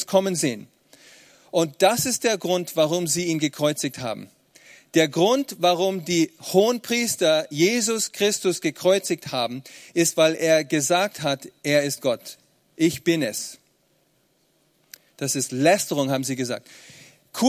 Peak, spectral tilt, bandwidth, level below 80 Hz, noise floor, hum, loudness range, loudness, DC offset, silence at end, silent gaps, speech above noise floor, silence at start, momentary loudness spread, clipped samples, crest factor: -2 dBFS; -3.5 dB/octave; 16 kHz; -66 dBFS; -65 dBFS; none; 5 LU; -22 LUFS; under 0.1%; 0 s; none; 43 dB; 0 s; 9 LU; under 0.1%; 20 dB